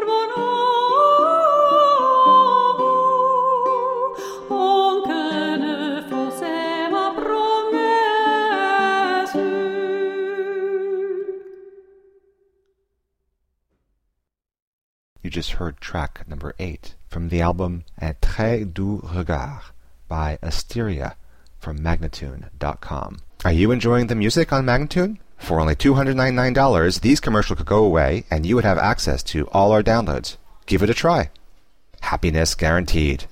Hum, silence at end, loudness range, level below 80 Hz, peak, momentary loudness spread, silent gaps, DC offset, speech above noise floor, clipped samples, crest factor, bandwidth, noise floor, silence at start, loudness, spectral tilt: none; 0 s; 13 LU; -32 dBFS; -4 dBFS; 15 LU; 14.62-15.16 s; under 0.1%; 60 dB; under 0.1%; 16 dB; 16 kHz; -79 dBFS; 0 s; -19 LUFS; -5.5 dB/octave